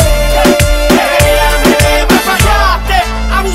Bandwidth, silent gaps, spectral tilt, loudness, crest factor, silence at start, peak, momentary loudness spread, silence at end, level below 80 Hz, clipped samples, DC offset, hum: 16.5 kHz; none; -4 dB/octave; -9 LUFS; 8 dB; 0 s; 0 dBFS; 4 LU; 0 s; -14 dBFS; under 0.1%; under 0.1%; none